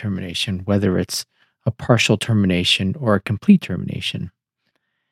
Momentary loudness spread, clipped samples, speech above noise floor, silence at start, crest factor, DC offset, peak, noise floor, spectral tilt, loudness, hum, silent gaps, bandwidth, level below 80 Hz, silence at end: 11 LU; under 0.1%; 53 dB; 0 s; 18 dB; under 0.1%; -2 dBFS; -72 dBFS; -5.5 dB/octave; -19 LUFS; none; none; 14.5 kHz; -56 dBFS; 0.85 s